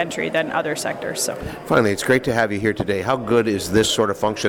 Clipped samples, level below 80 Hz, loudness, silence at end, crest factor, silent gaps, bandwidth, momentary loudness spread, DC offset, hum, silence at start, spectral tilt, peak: under 0.1%; -46 dBFS; -20 LUFS; 0 s; 14 dB; none; 18 kHz; 6 LU; under 0.1%; none; 0 s; -4 dB/octave; -6 dBFS